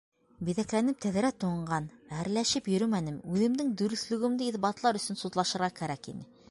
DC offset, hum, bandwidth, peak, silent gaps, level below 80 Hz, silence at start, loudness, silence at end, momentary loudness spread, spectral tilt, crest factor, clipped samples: under 0.1%; none; 11.5 kHz; -14 dBFS; none; -64 dBFS; 0.4 s; -31 LUFS; 0.25 s; 9 LU; -5 dB/octave; 18 dB; under 0.1%